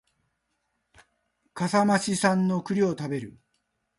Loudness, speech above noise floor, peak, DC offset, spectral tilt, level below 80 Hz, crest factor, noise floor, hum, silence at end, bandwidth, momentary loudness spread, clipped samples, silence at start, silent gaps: -25 LUFS; 52 dB; -8 dBFS; under 0.1%; -5.5 dB/octave; -68 dBFS; 18 dB; -77 dBFS; none; 0.7 s; 11.5 kHz; 12 LU; under 0.1%; 1.55 s; none